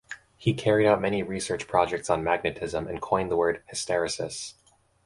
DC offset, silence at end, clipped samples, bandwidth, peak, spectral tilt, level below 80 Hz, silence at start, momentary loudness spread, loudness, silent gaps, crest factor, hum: under 0.1%; 0.55 s; under 0.1%; 11.5 kHz; -6 dBFS; -4.5 dB/octave; -54 dBFS; 0.1 s; 10 LU; -27 LUFS; none; 20 dB; none